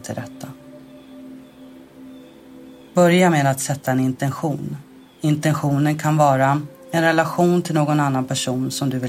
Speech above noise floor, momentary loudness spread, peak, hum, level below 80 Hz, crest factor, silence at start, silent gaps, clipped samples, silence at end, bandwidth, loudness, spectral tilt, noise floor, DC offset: 24 dB; 19 LU; -2 dBFS; none; -60 dBFS; 18 dB; 0 s; none; under 0.1%; 0 s; 16 kHz; -19 LUFS; -5.5 dB/octave; -43 dBFS; under 0.1%